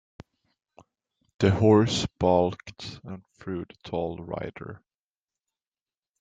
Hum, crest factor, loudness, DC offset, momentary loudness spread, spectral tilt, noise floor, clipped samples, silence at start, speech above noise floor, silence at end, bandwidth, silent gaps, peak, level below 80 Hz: none; 22 dB; -25 LUFS; under 0.1%; 21 LU; -6.5 dB/octave; under -90 dBFS; under 0.1%; 1.4 s; over 64 dB; 1.45 s; 9.2 kHz; none; -6 dBFS; -56 dBFS